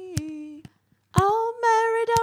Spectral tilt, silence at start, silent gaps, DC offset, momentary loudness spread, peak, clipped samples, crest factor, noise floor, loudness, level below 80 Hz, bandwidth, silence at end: -5 dB/octave; 0 s; none; under 0.1%; 17 LU; -2 dBFS; under 0.1%; 22 dB; -53 dBFS; -23 LUFS; -48 dBFS; 17 kHz; 0 s